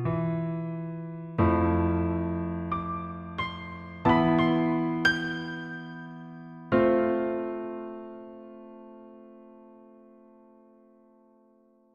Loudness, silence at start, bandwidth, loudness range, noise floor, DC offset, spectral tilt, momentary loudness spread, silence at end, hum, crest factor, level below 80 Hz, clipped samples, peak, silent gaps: -28 LUFS; 0 s; 7.6 kHz; 13 LU; -62 dBFS; under 0.1%; -7.5 dB/octave; 21 LU; 2.1 s; none; 22 dB; -50 dBFS; under 0.1%; -8 dBFS; none